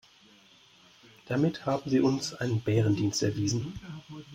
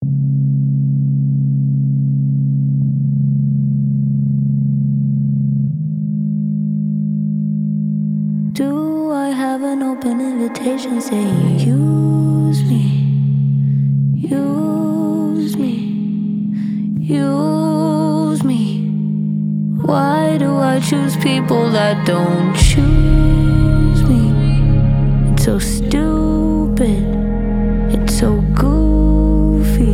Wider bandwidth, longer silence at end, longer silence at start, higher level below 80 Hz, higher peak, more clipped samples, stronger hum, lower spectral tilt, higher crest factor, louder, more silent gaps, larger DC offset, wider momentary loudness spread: about the same, 16 kHz vs 15 kHz; about the same, 0 s vs 0 s; first, 1.25 s vs 0 s; second, -60 dBFS vs -22 dBFS; second, -14 dBFS vs 0 dBFS; neither; neither; second, -6 dB/octave vs -7.5 dB/octave; about the same, 16 dB vs 14 dB; second, -29 LUFS vs -16 LUFS; neither; neither; first, 14 LU vs 6 LU